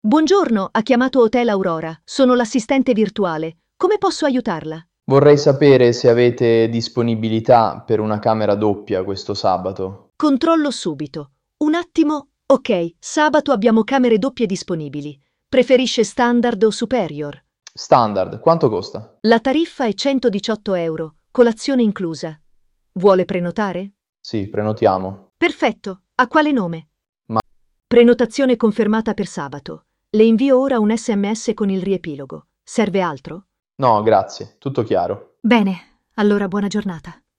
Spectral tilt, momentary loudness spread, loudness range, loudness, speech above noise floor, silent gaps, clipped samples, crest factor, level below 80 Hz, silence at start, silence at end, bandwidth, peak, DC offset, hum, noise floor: -6 dB/octave; 15 LU; 5 LU; -17 LUFS; 42 dB; 24.09-24.13 s, 27.09-27.13 s; under 0.1%; 16 dB; -54 dBFS; 0.05 s; 0.25 s; 10.5 kHz; -2 dBFS; under 0.1%; none; -58 dBFS